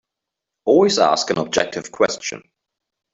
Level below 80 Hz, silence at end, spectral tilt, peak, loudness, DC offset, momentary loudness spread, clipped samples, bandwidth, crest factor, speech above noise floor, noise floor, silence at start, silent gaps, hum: -58 dBFS; 0.75 s; -3.5 dB/octave; -2 dBFS; -18 LUFS; under 0.1%; 13 LU; under 0.1%; 8 kHz; 18 dB; 65 dB; -83 dBFS; 0.65 s; none; none